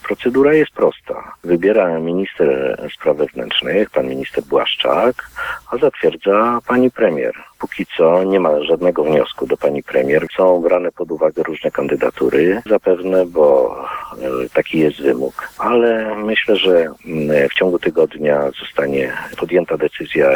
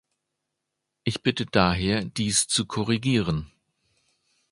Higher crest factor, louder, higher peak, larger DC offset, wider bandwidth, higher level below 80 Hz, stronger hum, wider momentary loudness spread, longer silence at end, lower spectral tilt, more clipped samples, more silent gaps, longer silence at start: second, 14 dB vs 24 dB; first, -16 LUFS vs -24 LUFS; about the same, 0 dBFS vs -2 dBFS; neither; first, 19 kHz vs 11.5 kHz; about the same, -50 dBFS vs -46 dBFS; neither; about the same, 9 LU vs 8 LU; second, 0 s vs 1.05 s; first, -6.5 dB/octave vs -4 dB/octave; neither; neither; second, 0.05 s vs 1.05 s